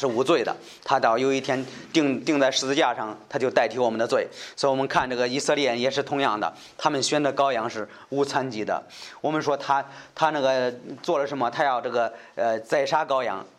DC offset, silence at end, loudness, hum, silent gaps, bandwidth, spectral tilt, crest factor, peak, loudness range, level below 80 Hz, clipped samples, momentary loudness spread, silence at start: under 0.1%; 0.1 s; -24 LUFS; none; none; 13 kHz; -4 dB/octave; 20 dB; -6 dBFS; 3 LU; -66 dBFS; under 0.1%; 9 LU; 0 s